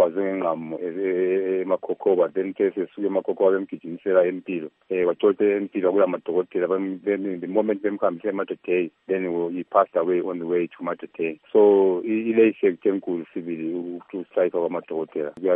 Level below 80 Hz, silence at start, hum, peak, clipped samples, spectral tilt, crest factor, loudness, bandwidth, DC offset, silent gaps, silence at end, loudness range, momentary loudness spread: -76 dBFS; 0 s; none; -4 dBFS; under 0.1%; -10 dB/octave; 18 dB; -23 LUFS; 3.7 kHz; under 0.1%; none; 0 s; 3 LU; 10 LU